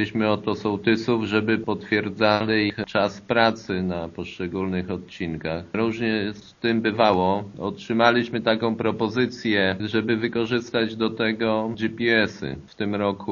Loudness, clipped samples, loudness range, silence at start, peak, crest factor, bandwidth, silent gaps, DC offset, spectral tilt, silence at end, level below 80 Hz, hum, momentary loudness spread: -23 LUFS; under 0.1%; 3 LU; 0 s; 0 dBFS; 22 dB; 7.2 kHz; none; under 0.1%; -4 dB/octave; 0 s; -56 dBFS; none; 10 LU